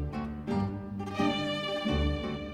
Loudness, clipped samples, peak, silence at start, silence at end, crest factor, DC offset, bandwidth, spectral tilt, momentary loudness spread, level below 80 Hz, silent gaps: -32 LUFS; under 0.1%; -16 dBFS; 0 s; 0 s; 16 dB; under 0.1%; 12 kHz; -6.5 dB/octave; 7 LU; -40 dBFS; none